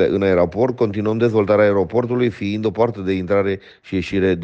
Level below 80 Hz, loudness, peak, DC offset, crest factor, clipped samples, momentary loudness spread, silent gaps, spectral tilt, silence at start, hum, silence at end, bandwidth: -48 dBFS; -18 LUFS; -4 dBFS; under 0.1%; 14 dB; under 0.1%; 8 LU; none; -8 dB/octave; 0 s; none; 0 s; 7.8 kHz